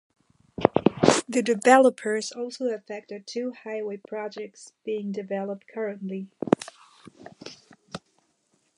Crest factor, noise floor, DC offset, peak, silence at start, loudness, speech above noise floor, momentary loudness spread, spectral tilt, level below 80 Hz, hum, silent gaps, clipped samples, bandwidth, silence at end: 26 dB; -70 dBFS; under 0.1%; 0 dBFS; 0.6 s; -25 LUFS; 44 dB; 23 LU; -4.5 dB/octave; -62 dBFS; none; none; under 0.1%; 11.5 kHz; 0.8 s